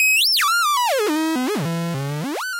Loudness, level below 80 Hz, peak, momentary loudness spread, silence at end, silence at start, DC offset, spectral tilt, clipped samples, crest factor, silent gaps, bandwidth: -19 LUFS; -68 dBFS; -10 dBFS; 11 LU; 0 s; 0 s; under 0.1%; -3 dB/octave; under 0.1%; 10 dB; none; 16 kHz